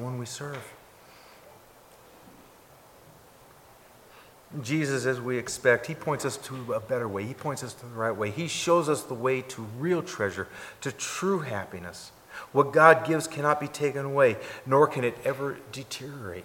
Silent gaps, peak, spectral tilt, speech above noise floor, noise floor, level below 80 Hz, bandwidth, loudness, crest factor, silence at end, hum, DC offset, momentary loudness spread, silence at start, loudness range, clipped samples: none; -2 dBFS; -5 dB/octave; 27 dB; -54 dBFS; -66 dBFS; 17 kHz; -27 LUFS; 26 dB; 0 s; none; under 0.1%; 16 LU; 0 s; 10 LU; under 0.1%